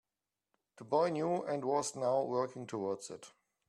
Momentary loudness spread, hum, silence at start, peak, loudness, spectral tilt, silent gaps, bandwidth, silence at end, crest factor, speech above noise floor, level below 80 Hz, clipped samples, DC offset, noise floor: 9 LU; none; 0.8 s; -18 dBFS; -35 LUFS; -5 dB/octave; none; 12.5 kHz; 0.4 s; 18 dB; over 55 dB; -82 dBFS; under 0.1%; under 0.1%; under -90 dBFS